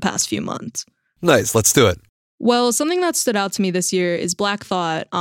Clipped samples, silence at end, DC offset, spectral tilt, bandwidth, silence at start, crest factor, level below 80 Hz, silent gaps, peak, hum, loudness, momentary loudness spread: under 0.1%; 0 s; under 0.1%; -3.5 dB/octave; 17 kHz; 0 s; 18 dB; -52 dBFS; 2.09-2.38 s; -2 dBFS; none; -18 LUFS; 11 LU